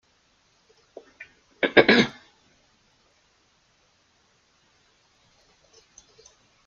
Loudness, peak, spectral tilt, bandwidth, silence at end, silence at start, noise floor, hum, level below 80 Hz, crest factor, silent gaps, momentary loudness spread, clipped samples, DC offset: -19 LUFS; 0 dBFS; -4.5 dB/octave; 7.4 kHz; 4.55 s; 1.6 s; -65 dBFS; none; -66 dBFS; 30 dB; none; 31 LU; under 0.1%; under 0.1%